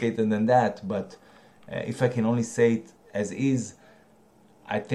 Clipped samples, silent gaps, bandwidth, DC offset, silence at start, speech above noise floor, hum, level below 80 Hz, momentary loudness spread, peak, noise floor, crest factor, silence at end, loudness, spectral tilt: under 0.1%; none; 11.5 kHz; under 0.1%; 0 s; 33 dB; none; -66 dBFS; 13 LU; -10 dBFS; -58 dBFS; 18 dB; 0 s; -26 LUFS; -6.5 dB/octave